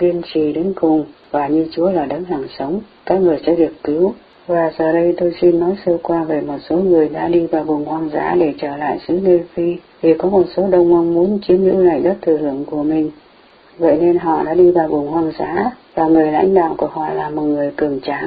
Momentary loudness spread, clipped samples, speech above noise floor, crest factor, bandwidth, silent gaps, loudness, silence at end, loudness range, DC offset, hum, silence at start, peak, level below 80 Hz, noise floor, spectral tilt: 8 LU; under 0.1%; 31 dB; 14 dB; 5 kHz; none; -16 LUFS; 0 s; 3 LU; under 0.1%; none; 0 s; 0 dBFS; -48 dBFS; -47 dBFS; -12 dB/octave